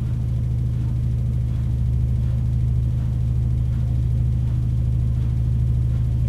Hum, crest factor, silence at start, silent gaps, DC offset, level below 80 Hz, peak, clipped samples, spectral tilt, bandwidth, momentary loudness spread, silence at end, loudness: none; 10 dB; 0 s; none; 0.1%; -24 dBFS; -10 dBFS; under 0.1%; -9.5 dB/octave; 3.9 kHz; 2 LU; 0 s; -22 LUFS